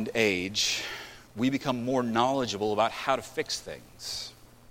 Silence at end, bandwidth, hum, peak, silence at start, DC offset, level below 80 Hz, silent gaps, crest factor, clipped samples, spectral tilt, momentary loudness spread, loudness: 0.4 s; 16.5 kHz; none; -8 dBFS; 0 s; under 0.1%; -60 dBFS; none; 22 dB; under 0.1%; -3.5 dB/octave; 13 LU; -29 LUFS